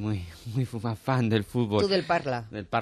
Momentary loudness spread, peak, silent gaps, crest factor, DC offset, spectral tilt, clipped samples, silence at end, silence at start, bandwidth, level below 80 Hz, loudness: 9 LU; -10 dBFS; none; 16 dB; under 0.1%; -7 dB/octave; under 0.1%; 0 s; 0 s; 13 kHz; -54 dBFS; -28 LUFS